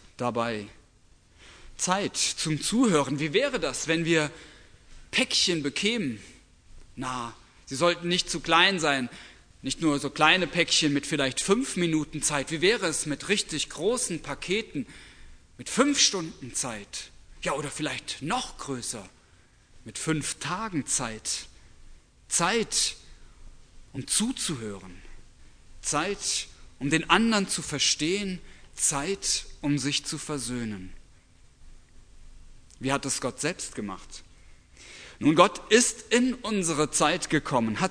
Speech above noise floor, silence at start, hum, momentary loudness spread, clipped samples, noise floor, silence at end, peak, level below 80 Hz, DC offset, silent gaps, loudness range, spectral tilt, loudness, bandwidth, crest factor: 31 dB; 0.2 s; none; 16 LU; under 0.1%; -58 dBFS; 0 s; -2 dBFS; -52 dBFS; under 0.1%; none; 9 LU; -3 dB/octave; -26 LUFS; 11 kHz; 26 dB